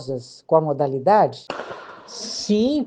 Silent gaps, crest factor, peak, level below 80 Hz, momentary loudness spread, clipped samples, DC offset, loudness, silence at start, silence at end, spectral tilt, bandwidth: none; 18 dB; -2 dBFS; -60 dBFS; 17 LU; under 0.1%; under 0.1%; -20 LUFS; 0 s; 0 s; -5.5 dB/octave; 9.6 kHz